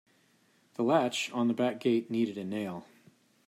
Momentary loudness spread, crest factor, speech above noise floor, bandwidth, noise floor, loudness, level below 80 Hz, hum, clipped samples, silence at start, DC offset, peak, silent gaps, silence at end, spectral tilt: 11 LU; 18 dB; 38 dB; 15 kHz; -67 dBFS; -31 LUFS; -80 dBFS; none; under 0.1%; 0.8 s; under 0.1%; -14 dBFS; none; 0.65 s; -5 dB/octave